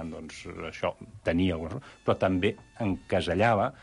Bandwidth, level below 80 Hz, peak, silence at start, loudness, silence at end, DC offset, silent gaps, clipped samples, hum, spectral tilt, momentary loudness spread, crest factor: 11.5 kHz; -46 dBFS; -12 dBFS; 0 s; -29 LUFS; 0.1 s; under 0.1%; none; under 0.1%; none; -6.5 dB/octave; 14 LU; 16 dB